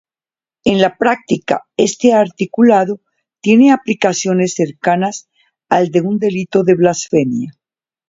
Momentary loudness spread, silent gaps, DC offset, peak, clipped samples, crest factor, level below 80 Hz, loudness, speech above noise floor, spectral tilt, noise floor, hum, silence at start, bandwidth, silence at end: 9 LU; none; under 0.1%; 0 dBFS; under 0.1%; 14 dB; -56 dBFS; -14 LUFS; over 77 dB; -5.5 dB/octave; under -90 dBFS; none; 0.65 s; 7.8 kHz; 0.6 s